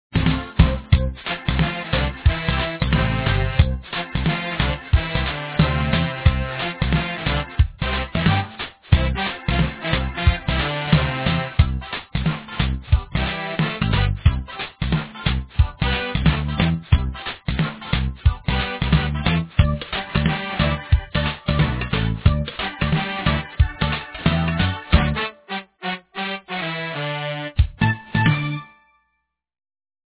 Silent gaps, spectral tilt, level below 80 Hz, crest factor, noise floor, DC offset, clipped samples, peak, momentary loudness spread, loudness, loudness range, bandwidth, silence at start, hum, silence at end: none; -10 dB/octave; -26 dBFS; 20 dB; -73 dBFS; under 0.1%; under 0.1%; 0 dBFS; 7 LU; -22 LUFS; 2 LU; 4 kHz; 0.1 s; none; 1.5 s